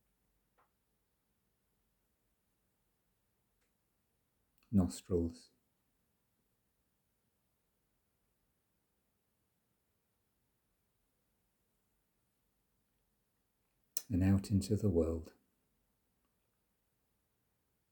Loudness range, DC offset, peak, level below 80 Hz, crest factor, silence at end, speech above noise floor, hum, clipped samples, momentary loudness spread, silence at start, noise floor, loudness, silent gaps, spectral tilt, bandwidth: 7 LU; under 0.1%; -14 dBFS; -66 dBFS; 30 dB; 2.6 s; 48 dB; none; under 0.1%; 9 LU; 4.7 s; -82 dBFS; -36 LUFS; none; -7 dB/octave; over 20 kHz